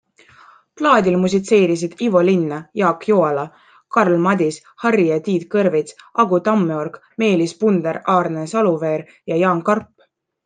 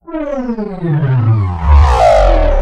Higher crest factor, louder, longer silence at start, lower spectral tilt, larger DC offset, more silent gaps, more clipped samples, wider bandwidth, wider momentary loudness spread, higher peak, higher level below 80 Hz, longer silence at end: first, 16 dB vs 10 dB; second, -18 LUFS vs -12 LUFS; first, 0.75 s vs 0.1 s; second, -6.5 dB/octave vs -8 dB/octave; neither; neither; neither; about the same, 9.4 kHz vs 9 kHz; second, 8 LU vs 11 LU; about the same, -2 dBFS vs 0 dBFS; second, -62 dBFS vs -14 dBFS; first, 0.6 s vs 0 s